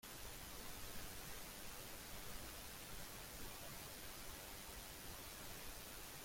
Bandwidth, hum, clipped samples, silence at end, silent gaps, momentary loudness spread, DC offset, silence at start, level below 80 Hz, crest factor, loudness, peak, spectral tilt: 16.5 kHz; none; under 0.1%; 0 s; none; 1 LU; under 0.1%; 0.05 s; -60 dBFS; 18 dB; -52 LUFS; -36 dBFS; -2 dB/octave